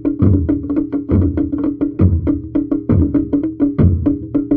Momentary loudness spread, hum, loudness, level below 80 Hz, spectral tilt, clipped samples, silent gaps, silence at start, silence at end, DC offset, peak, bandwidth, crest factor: 5 LU; none; -16 LUFS; -28 dBFS; -13.5 dB/octave; under 0.1%; none; 0 s; 0 s; under 0.1%; 0 dBFS; 3.3 kHz; 14 dB